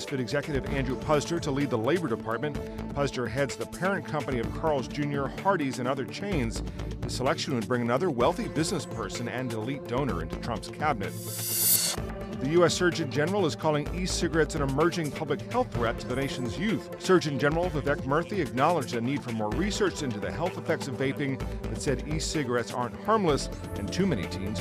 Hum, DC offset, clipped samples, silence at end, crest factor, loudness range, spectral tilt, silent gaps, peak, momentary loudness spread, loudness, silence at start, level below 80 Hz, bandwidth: none; under 0.1%; under 0.1%; 0 s; 18 dB; 4 LU; -4.5 dB/octave; none; -10 dBFS; 8 LU; -29 LUFS; 0 s; -44 dBFS; 15.5 kHz